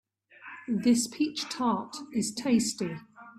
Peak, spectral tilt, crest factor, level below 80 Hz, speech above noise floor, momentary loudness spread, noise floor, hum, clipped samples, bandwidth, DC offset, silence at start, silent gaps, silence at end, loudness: -14 dBFS; -4 dB/octave; 16 dB; -68 dBFS; 22 dB; 18 LU; -50 dBFS; none; under 0.1%; 14 kHz; under 0.1%; 0.4 s; none; 0 s; -29 LUFS